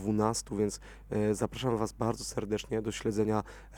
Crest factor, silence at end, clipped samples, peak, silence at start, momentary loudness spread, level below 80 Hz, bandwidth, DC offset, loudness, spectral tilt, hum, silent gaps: 20 dB; 0 s; under 0.1%; -12 dBFS; 0 s; 5 LU; -52 dBFS; 19 kHz; under 0.1%; -33 LUFS; -5.5 dB/octave; none; none